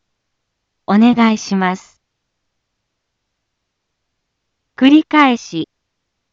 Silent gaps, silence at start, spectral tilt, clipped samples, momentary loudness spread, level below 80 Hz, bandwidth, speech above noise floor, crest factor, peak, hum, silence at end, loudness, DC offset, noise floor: none; 0.9 s; -5.5 dB/octave; under 0.1%; 17 LU; -62 dBFS; 7.6 kHz; 61 dB; 16 dB; 0 dBFS; none; 0.7 s; -13 LUFS; under 0.1%; -74 dBFS